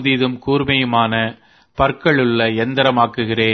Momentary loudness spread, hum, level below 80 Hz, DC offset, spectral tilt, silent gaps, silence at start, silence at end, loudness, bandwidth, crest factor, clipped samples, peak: 4 LU; none; -42 dBFS; under 0.1%; -7.5 dB/octave; none; 0 s; 0 s; -16 LUFS; 6.4 kHz; 16 dB; under 0.1%; 0 dBFS